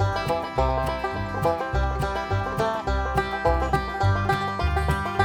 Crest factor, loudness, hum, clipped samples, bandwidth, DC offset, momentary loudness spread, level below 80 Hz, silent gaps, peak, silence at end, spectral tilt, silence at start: 18 dB; -25 LUFS; none; under 0.1%; 17.5 kHz; under 0.1%; 3 LU; -32 dBFS; none; -6 dBFS; 0 s; -6.5 dB/octave; 0 s